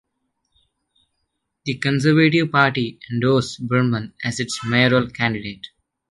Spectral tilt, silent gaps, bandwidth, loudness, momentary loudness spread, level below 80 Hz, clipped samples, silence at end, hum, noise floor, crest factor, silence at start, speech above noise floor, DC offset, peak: -5.5 dB/octave; none; 11.5 kHz; -19 LUFS; 13 LU; -56 dBFS; under 0.1%; 0.45 s; none; -75 dBFS; 20 dB; 1.65 s; 56 dB; under 0.1%; -2 dBFS